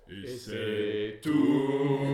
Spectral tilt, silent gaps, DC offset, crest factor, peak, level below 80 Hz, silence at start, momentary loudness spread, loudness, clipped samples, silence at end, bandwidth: -7 dB/octave; none; under 0.1%; 14 dB; -14 dBFS; -64 dBFS; 0.1 s; 13 LU; -29 LUFS; under 0.1%; 0 s; 13.5 kHz